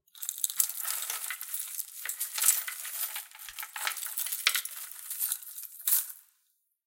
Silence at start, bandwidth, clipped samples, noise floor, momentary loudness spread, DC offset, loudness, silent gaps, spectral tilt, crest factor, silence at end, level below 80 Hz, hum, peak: 0.15 s; 17 kHz; under 0.1%; -75 dBFS; 13 LU; under 0.1%; -30 LUFS; none; 6 dB/octave; 30 dB; 0.65 s; -84 dBFS; none; -4 dBFS